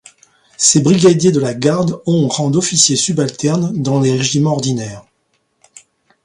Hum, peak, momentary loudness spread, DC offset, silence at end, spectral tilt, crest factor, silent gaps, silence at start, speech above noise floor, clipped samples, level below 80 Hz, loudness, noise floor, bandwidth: none; 0 dBFS; 7 LU; under 0.1%; 1.25 s; -4.5 dB/octave; 14 dB; none; 0.6 s; 51 dB; under 0.1%; -52 dBFS; -13 LUFS; -64 dBFS; 11.5 kHz